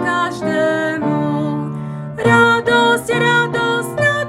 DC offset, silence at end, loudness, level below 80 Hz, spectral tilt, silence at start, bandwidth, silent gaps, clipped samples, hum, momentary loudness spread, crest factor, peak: under 0.1%; 0 s; -15 LUFS; -52 dBFS; -5 dB/octave; 0 s; 16 kHz; none; under 0.1%; none; 10 LU; 16 dB; 0 dBFS